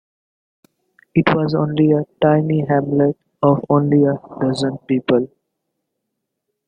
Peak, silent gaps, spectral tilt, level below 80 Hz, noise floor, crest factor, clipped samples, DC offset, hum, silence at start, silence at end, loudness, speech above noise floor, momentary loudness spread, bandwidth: -2 dBFS; none; -8.5 dB/octave; -56 dBFS; -77 dBFS; 16 dB; under 0.1%; under 0.1%; none; 1.15 s; 1.4 s; -17 LUFS; 61 dB; 6 LU; 9.6 kHz